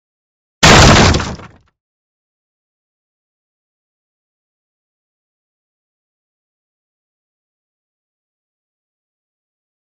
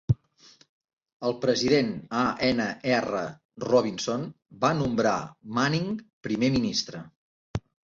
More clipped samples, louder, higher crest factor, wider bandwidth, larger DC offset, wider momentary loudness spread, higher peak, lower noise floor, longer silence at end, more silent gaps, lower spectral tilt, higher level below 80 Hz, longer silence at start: neither; first, -7 LUFS vs -27 LUFS; about the same, 18 dB vs 18 dB; first, 16 kHz vs 7.6 kHz; neither; about the same, 14 LU vs 14 LU; first, 0 dBFS vs -8 dBFS; second, -32 dBFS vs -57 dBFS; first, 8.5 s vs 0.3 s; second, none vs 0.69-0.97 s, 1.13-1.20 s, 3.45-3.49 s, 6.13-6.21 s, 7.16-7.54 s; second, -4 dB/octave vs -5.5 dB/octave; first, -28 dBFS vs -52 dBFS; first, 0.6 s vs 0.1 s